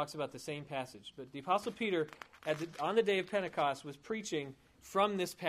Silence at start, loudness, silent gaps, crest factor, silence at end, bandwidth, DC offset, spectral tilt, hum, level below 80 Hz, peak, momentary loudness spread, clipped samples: 0 s; -36 LUFS; none; 20 dB; 0 s; 15.5 kHz; under 0.1%; -4.5 dB/octave; none; -74 dBFS; -16 dBFS; 14 LU; under 0.1%